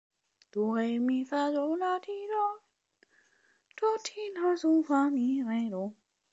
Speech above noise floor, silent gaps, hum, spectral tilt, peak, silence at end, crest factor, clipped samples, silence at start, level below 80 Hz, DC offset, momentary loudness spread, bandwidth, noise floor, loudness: 40 dB; none; none; -5.5 dB/octave; -14 dBFS; 0.4 s; 16 dB; under 0.1%; 0.55 s; -86 dBFS; under 0.1%; 9 LU; 8 kHz; -70 dBFS; -30 LUFS